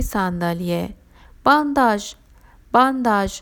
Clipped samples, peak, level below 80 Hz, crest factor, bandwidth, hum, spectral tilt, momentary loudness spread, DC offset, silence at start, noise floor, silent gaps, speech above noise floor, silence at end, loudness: under 0.1%; -2 dBFS; -38 dBFS; 20 dB; over 20 kHz; none; -5.5 dB/octave; 10 LU; under 0.1%; 0 s; -49 dBFS; none; 30 dB; 0 s; -19 LUFS